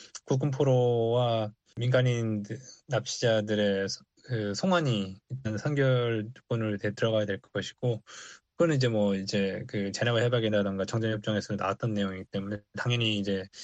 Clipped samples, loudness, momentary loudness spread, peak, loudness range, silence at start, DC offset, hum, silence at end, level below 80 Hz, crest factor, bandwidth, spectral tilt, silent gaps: under 0.1%; -29 LUFS; 10 LU; -10 dBFS; 2 LU; 0 s; under 0.1%; none; 0 s; -66 dBFS; 18 dB; 8.4 kHz; -6 dB/octave; none